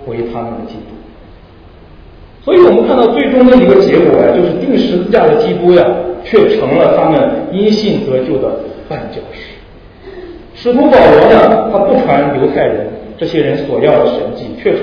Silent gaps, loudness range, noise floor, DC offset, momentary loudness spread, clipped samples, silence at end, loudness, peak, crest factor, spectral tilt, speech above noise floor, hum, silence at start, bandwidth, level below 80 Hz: none; 6 LU; -37 dBFS; under 0.1%; 17 LU; 1%; 0 s; -9 LUFS; 0 dBFS; 10 dB; -8 dB/octave; 28 dB; none; 0 s; 5.4 kHz; -38 dBFS